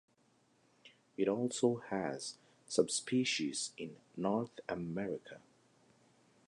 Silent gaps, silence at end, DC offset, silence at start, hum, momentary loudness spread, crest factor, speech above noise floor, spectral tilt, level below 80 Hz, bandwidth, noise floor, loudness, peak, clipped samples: none; 1.1 s; under 0.1%; 0.85 s; none; 14 LU; 24 dB; 36 dB; -4 dB/octave; -76 dBFS; 11 kHz; -72 dBFS; -37 LUFS; -14 dBFS; under 0.1%